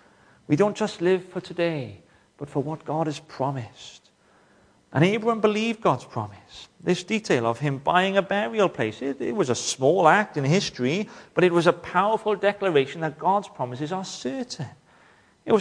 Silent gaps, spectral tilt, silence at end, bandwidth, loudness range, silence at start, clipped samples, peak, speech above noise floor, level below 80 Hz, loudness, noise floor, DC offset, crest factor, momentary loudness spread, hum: none; -5.5 dB/octave; 0 s; 10.5 kHz; 7 LU; 0.5 s; under 0.1%; -2 dBFS; 35 dB; -66 dBFS; -24 LUFS; -59 dBFS; under 0.1%; 22 dB; 13 LU; none